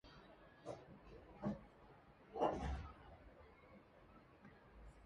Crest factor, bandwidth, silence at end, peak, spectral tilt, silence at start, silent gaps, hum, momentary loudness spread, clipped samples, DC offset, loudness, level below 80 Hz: 26 dB; 10 kHz; 0 s; -24 dBFS; -7.5 dB/octave; 0.05 s; none; none; 23 LU; under 0.1%; under 0.1%; -47 LUFS; -60 dBFS